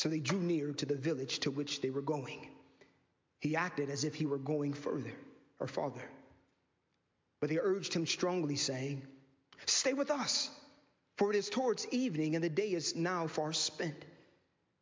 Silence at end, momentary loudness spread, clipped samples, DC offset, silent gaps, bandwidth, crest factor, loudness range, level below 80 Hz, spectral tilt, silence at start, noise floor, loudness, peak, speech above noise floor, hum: 0.65 s; 9 LU; under 0.1%; under 0.1%; none; 7.8 kHz; 18 dB; 5 LU; -78 dBFS; -4 dB/octave; 0 s; -80 dBFS; -36 LUFS; -18 dBFS; 45 dB; none